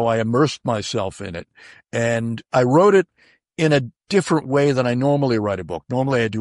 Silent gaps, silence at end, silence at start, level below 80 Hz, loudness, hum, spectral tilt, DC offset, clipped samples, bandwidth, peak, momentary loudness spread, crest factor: none; 0 s; 0 s; -54 dBFS; -19 LUFS; none; -6 dB/octave; under 0.1%; under 0.1%; 11.5 kHz; -4 dBFS; 13 LU; 16 dB